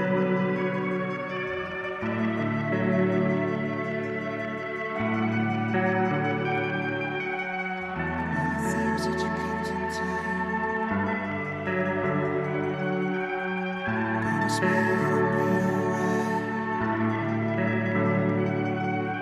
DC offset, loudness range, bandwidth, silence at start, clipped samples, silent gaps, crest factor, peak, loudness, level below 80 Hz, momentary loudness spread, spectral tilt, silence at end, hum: under 0.1%; 3 LU; 13.5 kHz; 0 s; under 0.1%; none; 16 dB; -12 dBFS; -27 LUFS; -56 dBFS; 6 LU; -7 dB/octave; 0 s; none